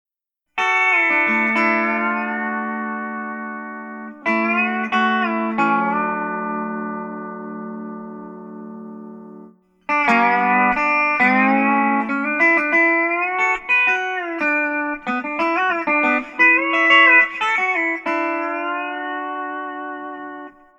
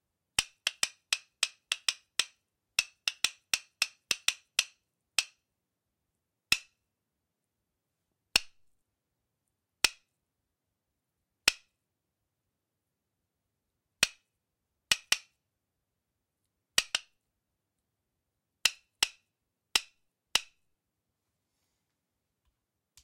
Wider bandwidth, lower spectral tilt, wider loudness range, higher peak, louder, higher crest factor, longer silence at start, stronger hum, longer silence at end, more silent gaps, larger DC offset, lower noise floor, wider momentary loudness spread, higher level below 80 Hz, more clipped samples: second, 9.2 kHz vs 16 kHz; first, -5 dB/octave vs 2 dB/octave; first, 9 LU vs 6 LU; first, 0 dBFS vs -6 dBFS; first, -17 LUFS vs -31 LUFS; second, 20 dB vs 30 dB; first, 0.55 s vs 0.4 s; first, 60 Hz at -70 dBFS vs none; second, 0.3 s vs 2.6 s; neither; neither; second, -77 dBFS vs -86 dBFS; first, 17 LU vs 5 LU; first, -60 dBFS vs -66 dBFS; neither